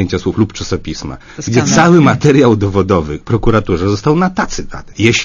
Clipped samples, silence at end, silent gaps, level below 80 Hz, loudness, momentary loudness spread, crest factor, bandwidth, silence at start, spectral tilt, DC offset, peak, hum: 0.3%; 0 s; none; -30 dBFS; -12 LUFS; 16 LU; 12 dB; 7.4 kHz; 0 s; -5.5 dB/octave; under 0.1%; 0 dBFS; none